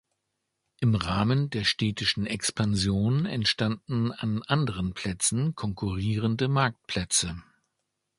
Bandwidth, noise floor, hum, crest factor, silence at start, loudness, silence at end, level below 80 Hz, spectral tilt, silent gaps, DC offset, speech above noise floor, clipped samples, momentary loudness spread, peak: 11.5 kHz; -81 dBFS; none; 20 dB; 0.8 s; -27 LUFS; 0.75 s; -48 dBFS; -4.5 dB/octave; none; under 0.1%; 54 dB; under 0.1%; 6 LU; -8 dBFS